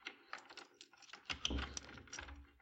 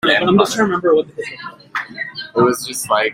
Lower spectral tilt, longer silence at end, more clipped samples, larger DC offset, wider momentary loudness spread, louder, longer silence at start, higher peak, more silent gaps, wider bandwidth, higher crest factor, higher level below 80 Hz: second, -2.5 dB/octave vs -4 dB/octave; about the same, 0 s vs 0 s; neither; neither; about the same, 16 LU vs 14 LU; second, -47 LUFS vs -17 LUFS; about the same, 0 s vs 0.05 s; second, -22 dBFS vs 0 dBFS; neither; second, 9 kHz vs 16 kHz; first, 28 dB vs 16 dB; about the same, -54 dBFS vs -56 dBFS